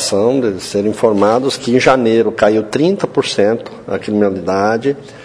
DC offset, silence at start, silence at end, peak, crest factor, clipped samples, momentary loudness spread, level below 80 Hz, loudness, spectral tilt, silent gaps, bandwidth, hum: under 0.1%; 0 s; 0 s; 0 dBFS; 14 dB; under 0.1%; 6 LU; -50 dBFS; -14 LUFS; -5 dB/octave; none; 11 kHz; none